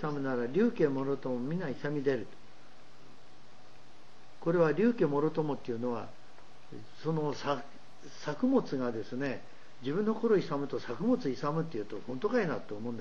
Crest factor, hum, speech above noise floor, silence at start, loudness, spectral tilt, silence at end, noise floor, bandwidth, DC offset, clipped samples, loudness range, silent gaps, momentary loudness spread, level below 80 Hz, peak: 18 dB; none; 27 dB; 0 s; -33 LUFS; -7.5 dB/octave; 0 s; -59 dBFS; 7.4 kHz; 0.9%; under 0.1%; 4 LU; none; 12 LU; -72 dBFS; -16 dBFS